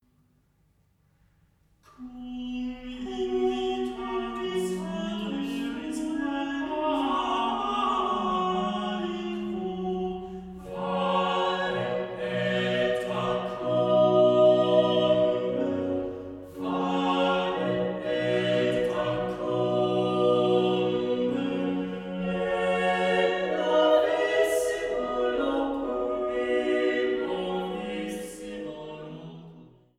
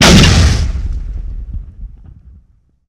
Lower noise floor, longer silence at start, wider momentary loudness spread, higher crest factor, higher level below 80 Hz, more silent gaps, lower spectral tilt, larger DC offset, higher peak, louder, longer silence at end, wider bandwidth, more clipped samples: first, -66 dBFS vs -50 dBFS; first, 2 s vs 0 s; second, 13 LU vs 23 LU; first, 18 dB vs 12 dB; second, -56 dBFS vs -18 dBFS; neither; first, -6 dB/octave vs -4 dB/octave; neither; second, -10 dBFS vs 0 dBFS; second, -27 LUFS vs -11 LUFS; second, 0.35 s vs 1 s; second, 14.5 kHz vs 16 kHz; second, under 0.1% vs 0.4%